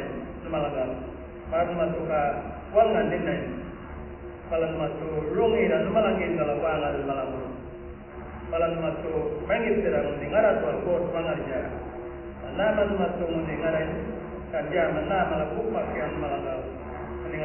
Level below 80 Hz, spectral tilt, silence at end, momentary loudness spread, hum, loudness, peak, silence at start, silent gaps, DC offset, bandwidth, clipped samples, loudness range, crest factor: -44 dBFS; -10.5 dB/octave; 0 s; 14 LU; none; -27 LUFS; -8 dBFS; 0 s; none; under 0.1%; 3.2 kHz; under 0.1%; 3 LU; 18 dB